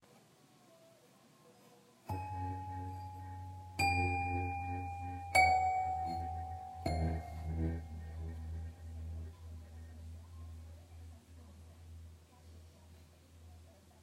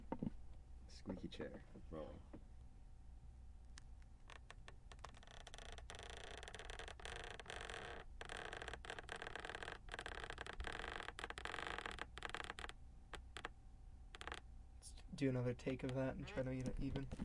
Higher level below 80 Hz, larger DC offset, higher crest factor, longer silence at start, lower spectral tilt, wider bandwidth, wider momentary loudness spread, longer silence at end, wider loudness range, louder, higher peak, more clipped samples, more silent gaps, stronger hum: first, -52 dBFS vs -58 dBFS; neither; about the same, 24 dB vs 20 dB; first, 0.15 s vs 0 s; about the same, -5 dB/octave vs -5 dB/octave; first, 16 kHz vs 11.5 kHz; first, 25 LU vs 17 LU; about the same, 0 s vs 0 s; first, 20 LU vs 12 LU; first, -38 LUFS vs -50 LUFS; first, -16 dBFS vs -30 dBFS; neither; neither; neither